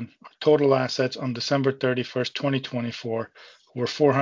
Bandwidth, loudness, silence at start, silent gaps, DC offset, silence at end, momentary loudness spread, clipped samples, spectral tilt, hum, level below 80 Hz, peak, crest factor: 7.6 kHz; -25 LUFS; 0 s; none; under 0.1%; 0 s; 11 LU; under 0.1%; -6 dB/octave; none; -68 dBFS; -6 dBFS; 18 dB